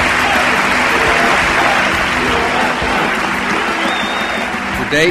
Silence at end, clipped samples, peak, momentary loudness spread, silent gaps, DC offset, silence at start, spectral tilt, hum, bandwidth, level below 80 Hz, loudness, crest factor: 0 s; under 0.1%; -2 dBFS; 5 LU; none; 0.2%; 0 s; -3 dB/octave; none; 15.5 kHz; -34 dBFS; -13 LUFS; 12 dB